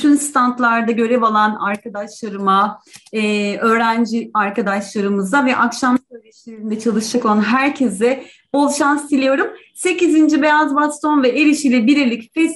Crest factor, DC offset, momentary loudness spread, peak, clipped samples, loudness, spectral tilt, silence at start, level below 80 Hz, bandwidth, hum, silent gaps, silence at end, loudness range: 14 dB; under 0.1%; 8 LU; -2 dBFS; under 0.1%; -16 LUFS; -4.5 dB/octave; 0 s; -64 dBFS; 12 kHz; none; none; 0 s; 3 LU